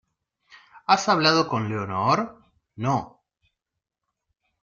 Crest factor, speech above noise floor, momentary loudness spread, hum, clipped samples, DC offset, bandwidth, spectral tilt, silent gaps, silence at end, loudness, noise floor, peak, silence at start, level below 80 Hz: 22 dB; 63 dB; 11 LU; none; under 0.1%; under 0.1%; 7.6 kHz; -4.5 dB/octave; none; 1.55 s; -23 LUFS; -85 dBFS; -4 dBFS; 0.75 s; -64 dBFS